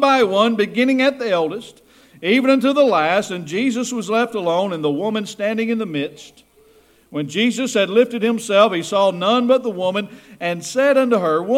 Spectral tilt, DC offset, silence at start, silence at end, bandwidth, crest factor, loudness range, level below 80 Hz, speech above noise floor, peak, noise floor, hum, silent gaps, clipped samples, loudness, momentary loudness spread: -4.5 dB/octave; under 0.1%; 0 s; 0 s; 15 kHz; 18 dB; 5 LU; -66 dBFS; 35 dB; 0 dBFS; -52 dBFS; none; none; under 0.1%; -18 LUFS; 10 LU